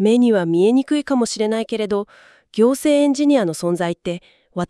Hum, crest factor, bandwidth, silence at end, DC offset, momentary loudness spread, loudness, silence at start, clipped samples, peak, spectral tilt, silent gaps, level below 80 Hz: none; 14 dB; 12 kHz; 0.05 s; under 0.1%; 13 LU; -18 LUFS; 0 s; under 0.1%; -4 dBFS; -5.5 dB/octave; none; -58 dBFS